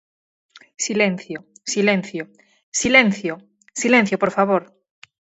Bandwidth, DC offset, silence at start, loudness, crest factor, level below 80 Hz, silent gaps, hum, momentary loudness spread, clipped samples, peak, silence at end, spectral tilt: 8.2 kHz; under 0.1%; 0.55 s; -19 LUFS; 20 dB; -58 dBFS; 2.63-2.72 s; none; 18 LU; under 0.1%; 0 dBFS; 0.75 s; -3.5 dB/octave